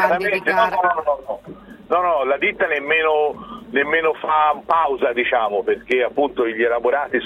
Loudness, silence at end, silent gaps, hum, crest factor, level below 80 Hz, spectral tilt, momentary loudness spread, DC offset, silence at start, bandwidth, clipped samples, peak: -19 LUFS; 0 s; none; none; 16 dB; -54 dBFS; -5.5 dB/octave; 6 LU; under 0.1%; 0 s; 13.5 kHz; under 0.1%; -4 dBFS